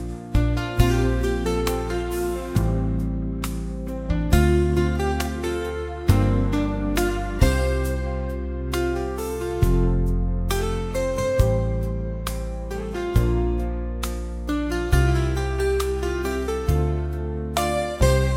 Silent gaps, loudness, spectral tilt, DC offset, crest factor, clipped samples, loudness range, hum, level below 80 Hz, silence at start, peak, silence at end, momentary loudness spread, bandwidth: none; -24 LUFS; -6.5 dB/octave; under 0.1%; 20 dB; under 0.1%; 2 LU; none; -26 dBFS; 0 s; -2 dBFS; 0 s; 9 LU; 16.5 kHz